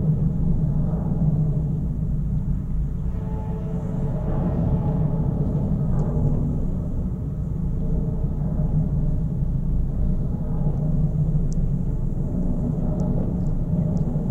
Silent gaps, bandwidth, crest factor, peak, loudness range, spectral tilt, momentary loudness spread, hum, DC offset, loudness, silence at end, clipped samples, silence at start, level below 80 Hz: none; 6.2 kHz; 12 dB; -8 dBFS; 2 LU; -11.5 dB/octave; 5 LU; none; under 0.1%; -25 LUFS; 0 s; under 0.1%; 0 s; -26 dBFS